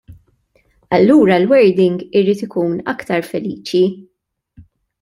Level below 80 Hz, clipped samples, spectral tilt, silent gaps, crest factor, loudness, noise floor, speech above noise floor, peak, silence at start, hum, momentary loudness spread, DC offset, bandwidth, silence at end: -56 dBFS; under 0.1%; -7 dB/octave; none; 14 dB; -15 LUFS; -58 dBFS; 44 dB; -2 dBFS; 0.1 s; none; 11 LU; under 0.1%; 13 kHz; 0.4 s